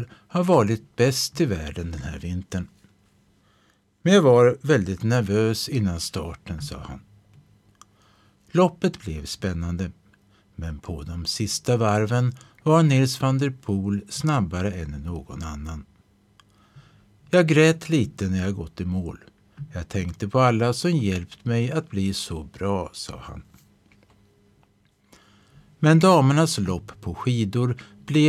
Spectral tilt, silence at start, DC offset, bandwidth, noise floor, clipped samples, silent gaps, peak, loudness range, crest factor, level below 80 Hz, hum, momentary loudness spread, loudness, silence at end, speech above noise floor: -6 dB/octave; 0 s; under 0.1%; 14.5 kHz; -63 dBFS; under 0.1%; none; -4 dBFS; 8 LU; 18 dB; -46 dBFS; none; 17 LU; -23 LUFS; 0 s; 40 dB